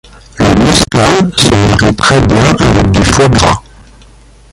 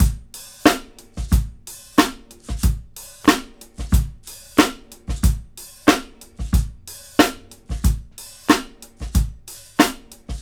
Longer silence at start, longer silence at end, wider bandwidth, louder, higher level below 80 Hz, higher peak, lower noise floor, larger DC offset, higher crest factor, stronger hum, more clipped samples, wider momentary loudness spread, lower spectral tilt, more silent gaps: first, 0.35 s vs 0 s; first, 0.95 s vs 0 s; second, 16 kHz vs over 20 kHz; first, -8 LUFS vs -21 LUFS; about the same, -22 dBFS vs -26 dBFS; about the same, 0 dBFS vs 0 dBFS; about the same, -38 dBFS vs -40 dBFS; neither; second, 8 dB vs 22 dB; neither; first, 0.2% vs under 0.1%; second, 3 LU vs 20 LU; about the same, -5 dB/octave vs -5 dB/octave; neither